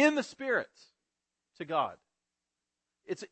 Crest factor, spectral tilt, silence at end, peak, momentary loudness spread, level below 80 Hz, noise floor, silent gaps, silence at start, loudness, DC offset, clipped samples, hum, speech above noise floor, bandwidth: 24 dB; -4 dB/octave; 0.05 s; -12 dBFS; 14 LU; -84 dBFS; -88 dBFS; none; 0 s; -33 LUFS; under 0.1%; under 0.1%; none; 57 dB; 8.4 kHz